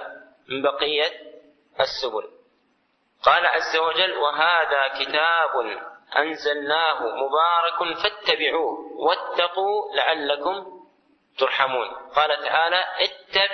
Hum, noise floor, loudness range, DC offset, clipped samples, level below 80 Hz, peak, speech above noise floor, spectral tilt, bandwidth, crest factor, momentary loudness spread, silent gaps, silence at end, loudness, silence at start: none; -67 dBFS; 3 LU; under 0.1%; under 0.1%; -64 dBFS; -2 dBFS; 45 dB; -2.5 dB/octave; 6.4 kHz; 22 dB; 9 LU; none; 0 s; -22 LUFS; 0 s